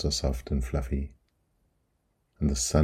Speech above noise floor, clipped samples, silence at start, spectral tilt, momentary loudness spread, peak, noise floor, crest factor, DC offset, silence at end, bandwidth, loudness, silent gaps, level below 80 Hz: 46 dB; under 0.1%; 0 s; -5 dB/octave; 7 LU; -8 dBFS; -74 dBFS; 22 dB; under 0.1%; 0 s; 14.5 kHz; -30 LUFS; none; -34 dBFS